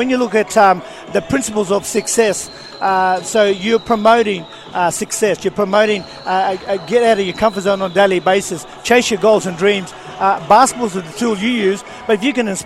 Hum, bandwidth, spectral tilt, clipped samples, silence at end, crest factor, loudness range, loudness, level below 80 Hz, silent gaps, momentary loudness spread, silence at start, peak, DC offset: none; 15.5 kHz; -3.5 dB/octave; under 0.1%; 0 s; 14 dB; 2 LU; -15 LUFS; -50 dBFS; none; 9 LU; 0 s; 0 dBFS; 0.1%